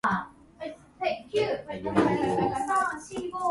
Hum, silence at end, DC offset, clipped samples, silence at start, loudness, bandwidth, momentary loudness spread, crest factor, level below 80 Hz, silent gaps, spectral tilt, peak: none; 0 s; under 0.1%; under 0.1%; 0.05 s; -28 LUFS; 11.5 kHz; 16 LU; 20 dB; -56 dBFS; none; -5.5 dB/octave; -8 dBFS